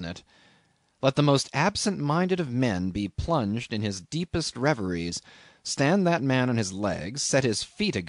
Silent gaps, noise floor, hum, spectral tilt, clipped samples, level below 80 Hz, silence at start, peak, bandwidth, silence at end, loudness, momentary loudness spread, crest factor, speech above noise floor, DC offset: none; -65 dBFS; none; -5 dB/octave; under 0.1%; -50 dBFS; 0 s; -6 dBFS; 11 kHz; 0 s; -26 LUFS; 8 LU; 20 dB; 39 dB; under 0.1%